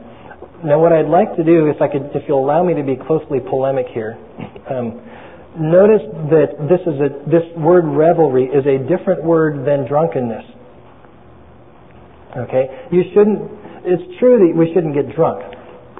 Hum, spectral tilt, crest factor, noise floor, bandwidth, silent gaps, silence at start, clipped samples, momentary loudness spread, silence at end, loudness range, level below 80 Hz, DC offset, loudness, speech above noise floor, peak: none; -13.5 dB/octave; 14 dB; -43 dBFS; 3.9 kHz; none; 0 s; under 0.1%; 15 LU; 0.2 s; 6 LU; -52 dBFS; 0.5%; -15 LUFS; 28 dB; 0 dBFS